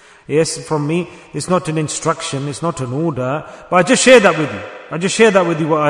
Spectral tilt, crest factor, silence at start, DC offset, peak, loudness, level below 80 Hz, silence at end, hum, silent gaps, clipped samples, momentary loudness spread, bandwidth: -4.5 dB/octave; 16 dB; 0.3 s; under 0.1%; 0 dBFS; -15 LUFS; -52 dBFS; 0 s; none; none; 0.3%; 14 LU; 12 kHz